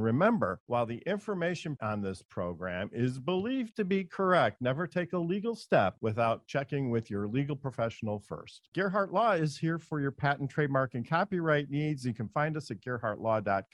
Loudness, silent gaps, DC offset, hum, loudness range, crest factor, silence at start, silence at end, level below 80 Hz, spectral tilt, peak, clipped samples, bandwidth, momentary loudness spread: -32 LUFS; 0.60-0.67 s, 2.25-2.29 s, 8.68-8.72 s; under 0.1%; none; 3 LU; 20 dB; 0 s; 0.1 s; -66 dBFS; -7 dB/octave; -12 dBFS; under 0.1%; 11.5 kHz; 9 LU